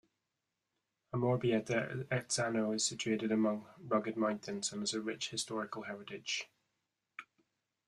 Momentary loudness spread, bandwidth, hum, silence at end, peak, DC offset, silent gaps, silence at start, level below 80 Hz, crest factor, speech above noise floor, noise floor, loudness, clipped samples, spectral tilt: 11 LU; 12.5 kHz; none; 0.65 s; -20 dBFS; under 0.1%; none; 1.15 s; -76 dBFS; 18 dB; 52 dB; -88 dBFS; -36 LUFS; under 0.1%; -4 dB/octave